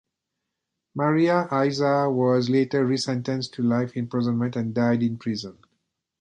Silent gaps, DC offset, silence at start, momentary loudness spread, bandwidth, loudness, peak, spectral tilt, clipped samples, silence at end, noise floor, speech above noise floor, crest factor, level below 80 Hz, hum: none; under 0.1%; 0.95 s; 8 LU; 9.6 kHz; -23 LUFS; -8 dBFS; -6.5 dB/octave; under 0.1%; 0.7 s; -82 dBFS; 59 dB; 16 dB; -64 dBFS; none